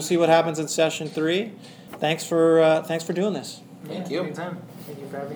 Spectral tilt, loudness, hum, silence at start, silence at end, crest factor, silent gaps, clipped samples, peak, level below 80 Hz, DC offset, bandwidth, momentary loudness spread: -4.5 dB/octave; -23 LUFS; none; 0 s; 0 s; 18 dB; none; under 0.1%; -4 dBFS; -76 dBFS; under 0.1%; over 20 kHz; 19 LU